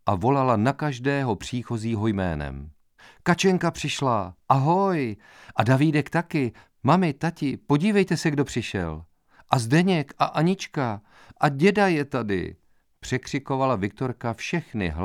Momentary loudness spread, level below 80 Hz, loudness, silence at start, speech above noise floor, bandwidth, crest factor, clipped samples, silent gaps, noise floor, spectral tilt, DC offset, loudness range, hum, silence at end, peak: 10 LU; -48 dBFS; -24 LUFS; 0.05 s; 30 dB; 14.5 kHz; 22 dB; under 0.1%; none; -54 dBFS; -6.5 dB/octave; under 0.1%; 3 LU; none; 0 s; -2 dBFS